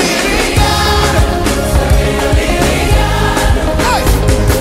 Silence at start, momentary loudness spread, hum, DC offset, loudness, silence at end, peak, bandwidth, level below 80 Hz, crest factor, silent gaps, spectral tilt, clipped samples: 0 s; 2 LU; none; under 0.1%; -12 LUFS; 0 s; 0 dBFS; 16.5 kHz; -14 dBFS; 10 dB; none; -4.5 dB/octave; under 0.1%